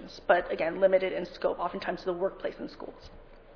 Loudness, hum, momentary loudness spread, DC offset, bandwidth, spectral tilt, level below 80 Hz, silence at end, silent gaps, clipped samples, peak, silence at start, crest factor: -29 LUFS; none; 16 LU; under 0.1%; 5.4 kHz; -3.5 dB/octave; -54 dBFS; 0 s; none; under 0.1%; -8 dBFS; 0 s; 22 dB